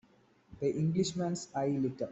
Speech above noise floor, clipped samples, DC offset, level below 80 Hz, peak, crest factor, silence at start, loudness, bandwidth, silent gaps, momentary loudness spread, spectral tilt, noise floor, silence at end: 33 dB; under 0.1%; under 0.1%; -66 dBFS; -20 dBFS; 14 dB; 0.5 s; -33 LUFS; 8.2 kHz; none; 4 LU; -6.5 dB/octave; -65 dBFS; 0 s